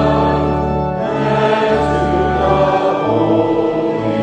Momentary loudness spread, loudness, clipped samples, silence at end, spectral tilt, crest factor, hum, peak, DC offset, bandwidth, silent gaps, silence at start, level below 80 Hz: 4 LU; -15 LUFS; under 0.1%; 0 s; -7.5 dB/octave; 12 dB; none; -2 dBFS; under 0.1%; 9.4 kHz; none; 0 s; -30 dBFS